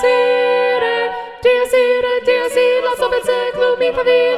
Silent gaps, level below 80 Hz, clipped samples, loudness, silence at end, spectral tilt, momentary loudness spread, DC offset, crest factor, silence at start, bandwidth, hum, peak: none; -50 dBFS; under 0.1%; -15 LUFS; 0 s; -2.5 dB/octave; 4 LU; under 0.1%; 12 dB; 0 s; 13 kHz; none; -2 dBFS